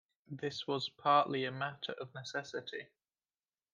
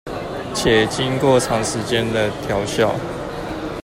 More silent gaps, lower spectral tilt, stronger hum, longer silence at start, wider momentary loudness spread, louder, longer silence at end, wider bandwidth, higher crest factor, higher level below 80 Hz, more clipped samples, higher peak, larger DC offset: neither; about the same, -4.5 dB/octave vs -4.5 dB/octave; neither; first, 0.3 s vs 0.05 s; first, 15 LU vs 11 LU; second, -36 LUFS vs -19 LUFS; first, 0.9 s vs 0 s; second, 9.6 kHz vs 16 kHz; first, 22 dB vs 16 dB; second, -84 dBFS vs -40 dBFS; neither; second, -16 dBFS vs -2 dBFS; neither